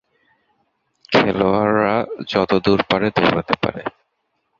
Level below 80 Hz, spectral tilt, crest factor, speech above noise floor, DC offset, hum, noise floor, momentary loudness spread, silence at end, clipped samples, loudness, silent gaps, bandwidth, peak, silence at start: -50 dBFS; -6.5 dB/octave; 18 dB; 53 dB; under 0.1%; none; -71 dBFS; 6 LU; 0.7 s; under 0.1%; -18 LUFS; none; 7.4 kHz; -2 dBFS; 1.1 s